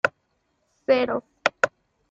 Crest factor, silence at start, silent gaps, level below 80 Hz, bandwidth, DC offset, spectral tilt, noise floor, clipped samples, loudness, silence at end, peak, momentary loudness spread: 24 dB; 0.05 s; none; -66 dBFS; 7.8 kHz; under 0.1%; -3.5 dB/octave; -72 dBFS; under 0.1%; -24 LUFS; 0.4 s; -2 dBFS; 6 LU